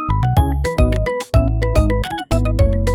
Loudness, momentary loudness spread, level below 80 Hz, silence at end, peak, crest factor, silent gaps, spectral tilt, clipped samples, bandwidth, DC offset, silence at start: -18 LUFS; 4 LU; -20 dBFS; 0 s; -4 dBFS; 12 dB; none; -7 dB/octave; under 0.1%; 15.5 kHz; under 0.1%; 0 s